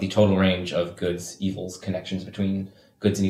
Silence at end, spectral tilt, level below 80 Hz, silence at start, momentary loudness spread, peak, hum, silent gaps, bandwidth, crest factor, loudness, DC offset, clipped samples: 0 s; -6 dB/octave; -58 dBFS; 0 s; 12 LU; -6 dBFS; none; none; 13.5 kHz; 18 dB; -26 LUFS; under 0.1%; under 0.1%